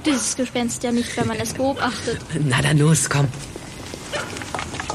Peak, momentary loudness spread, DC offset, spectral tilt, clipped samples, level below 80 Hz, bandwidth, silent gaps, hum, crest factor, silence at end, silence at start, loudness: -6 dBFS; 14 LU; under 0.1%; -4.5 dB/octave; under 0.1%; -46 dBFS; 13.5 kHz; none; none; 16 dB; 0 s; 0 s; -21 LUFS